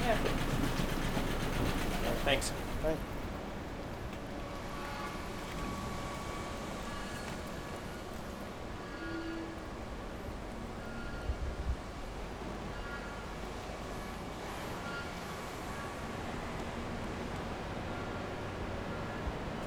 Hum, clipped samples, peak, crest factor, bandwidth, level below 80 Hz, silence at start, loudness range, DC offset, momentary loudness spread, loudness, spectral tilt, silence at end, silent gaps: none; under 0.1%; -16 dBFS; 22 dB; over 20 kHz; -44 dBFS; 0 s; 7 LU; under 0.1%; 9 LU; -39 LUFS; -5 dB/octave; 0 s; none